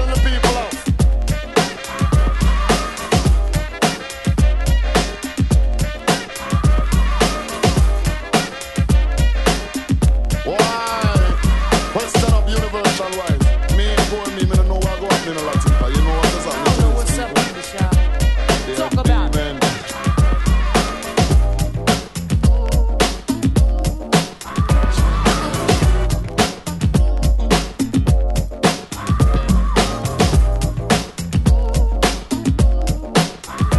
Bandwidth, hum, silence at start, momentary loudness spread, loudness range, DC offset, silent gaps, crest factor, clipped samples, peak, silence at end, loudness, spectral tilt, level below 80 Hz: 12.5 kHz; none; 0 s; 5 LU; 1 LU; under 0.1%; none; 16 dB; under 0.1%; 0 dBFS; 0 s; -18 LUFS; -5 dB/octave; -18 dBFS